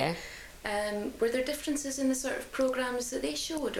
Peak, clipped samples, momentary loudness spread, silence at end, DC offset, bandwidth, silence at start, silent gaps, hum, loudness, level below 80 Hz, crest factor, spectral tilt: -14 dBFS; under 0.1%; 5 LU; 0 s; under 0.1%; 17.5 kHz; 0 s; none; none; -32 LUFS; -56 dBFS; 18 dB; -3 dB/octave